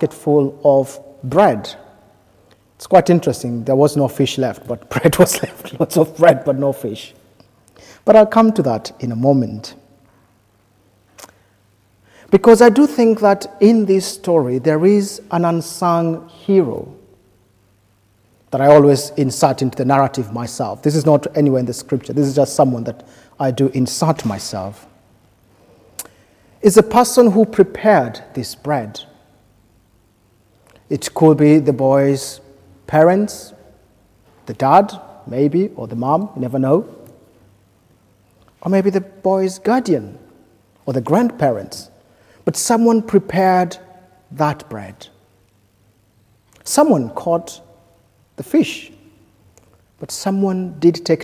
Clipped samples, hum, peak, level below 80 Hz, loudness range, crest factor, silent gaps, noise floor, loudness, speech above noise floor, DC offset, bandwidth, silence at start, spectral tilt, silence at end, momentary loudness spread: under 0.1%; none; 0 dBFS; -52 dBFS; 7 LU; 16 dB; none; -56 dBFS; -15 LUFS; 42 dB; under 0.1%; 16 kHz; 0 s; -6 dB/octave; 0 s; 17 LU